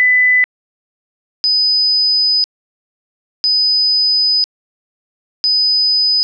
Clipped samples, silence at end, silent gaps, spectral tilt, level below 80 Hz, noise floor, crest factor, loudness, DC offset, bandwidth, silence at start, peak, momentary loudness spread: under 0.1%; 0 s; 0.44-1.44 s, 2.44-3.44 s, 4.44-5.44 s; 10 dB/octave; -80 dBFS; under -90 dBFS; 8 dB; -11 LUFS; under 0.1%; 6 kHz; 0 s; -8 dBFS; 8 LU